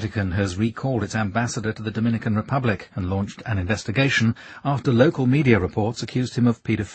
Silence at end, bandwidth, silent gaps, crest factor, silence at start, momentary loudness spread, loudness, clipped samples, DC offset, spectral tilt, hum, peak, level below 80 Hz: 0 s; 8.8 kHz; none; 20 dB; 0 s; 9 LU; -23 LUFS; under 0.1%; under 0.1%; -6.5 dB/octave; none; 0 dBFS; -48 dBFS